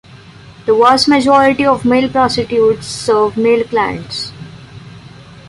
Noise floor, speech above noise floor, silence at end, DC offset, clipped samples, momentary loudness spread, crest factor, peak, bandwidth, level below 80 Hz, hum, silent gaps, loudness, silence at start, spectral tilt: -37 dBFS; 26 dB; 0 s; under 0.1%; under 0.1%; 14 LU; 12 dB; 0 dBFS; 11.5 kHz; -46 dBFS; none; none; -12 LUFS; 0.15 s; -4.5 dB/octave